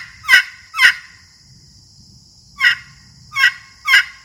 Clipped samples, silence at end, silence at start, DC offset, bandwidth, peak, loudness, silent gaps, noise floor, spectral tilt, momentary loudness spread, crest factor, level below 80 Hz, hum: 0.1%; 0.15 s; 0 s; under 0.1%; over 20 kHz; 0 dBFS; -14 LUFS; none; -46 dBFS; 1.5 dB/octave; 13 LU; 18 dB; -56 dBFS; none